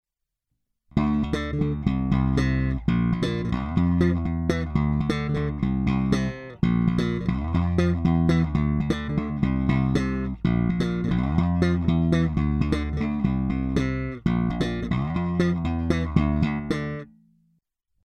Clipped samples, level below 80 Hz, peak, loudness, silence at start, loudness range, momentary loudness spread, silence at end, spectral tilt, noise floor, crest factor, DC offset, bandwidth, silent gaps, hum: under 0.1%; -34 dBFS; -6 dBFS; -24 LUFS; 0.95 s; 2 LU; 5 LU; 1 s; -8 dB/octave; -81 dBFS; 18 dB; under 0.1%; 8.8 kHz; none; none